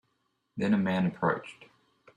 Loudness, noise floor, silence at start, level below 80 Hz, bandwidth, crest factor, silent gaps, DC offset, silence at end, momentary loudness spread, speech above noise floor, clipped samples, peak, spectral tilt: -29 LUFS; -77 dBFS; 0.55 s; -68 dBFS; 9.8 kHz; 20 dB; none; under 0.1%; 0.55 s; 17 LU; 48 dB; under 0.1%; -12 dBFS; -8 dB/octave